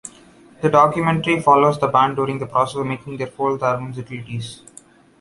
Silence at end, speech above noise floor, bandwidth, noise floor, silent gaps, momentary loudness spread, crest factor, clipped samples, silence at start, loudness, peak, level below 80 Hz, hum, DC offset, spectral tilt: 0.65 s; 29 dB; 11.5 kHz; -47 dBFS; none; 15 LU; 18 dB; under 0.1%; 0.05 s; -18 LUFS; -2 dBFS; -56 dBFS; none; under 0.1%; -6 dB/octave